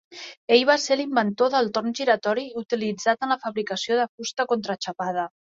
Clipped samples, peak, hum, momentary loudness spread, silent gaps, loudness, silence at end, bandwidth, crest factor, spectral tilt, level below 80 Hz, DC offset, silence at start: under 0.1%; -2 dBFS; none; 9 LU; 0.37-0.48 s, 4.09-4.18 s; -24 LUFS; 0.3 s; 7.8 kHz; 20 dB; -3.5 dB/octave; -72 dBFS; under 0.1%; 0.1 s